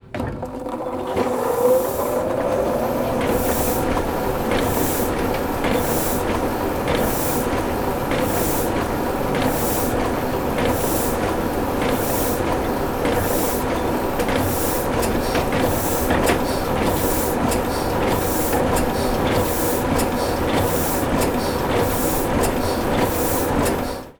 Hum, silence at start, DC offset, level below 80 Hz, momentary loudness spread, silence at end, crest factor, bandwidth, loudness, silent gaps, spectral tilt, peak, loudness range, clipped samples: none; 0.05 s; under 0.1%; -34 dBFS; 3 LU; 0.05 s; 16 dB; over 20 kHz; -21 LUFS; none; -5 dB/octave; -4 dBFS; 1 LU; under 0.1%